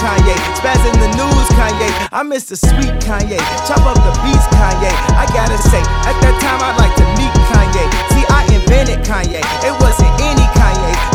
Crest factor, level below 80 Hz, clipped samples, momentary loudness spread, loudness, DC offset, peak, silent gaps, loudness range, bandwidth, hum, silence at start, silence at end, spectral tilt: 10 dB; -14 dBFS; 0.2%; 5 LU; -12 LUFS; under 0.1%; 0 dBFS; none; 2 LU; 16 kHz; none; 0 s; 0 s; -5 dB/octave